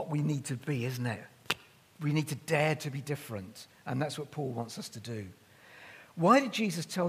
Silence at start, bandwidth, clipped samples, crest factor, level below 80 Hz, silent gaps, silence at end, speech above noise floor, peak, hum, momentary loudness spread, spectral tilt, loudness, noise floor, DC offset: 0 s; 15.5 kHz; under 0.1%; 28 dB; -74 dBFS; none; 0 s; 22 dB; -6 dBFS; none; 19 LU; -5.5 dB/octave; -33 LUFS; -54 dBFS; under 0.1%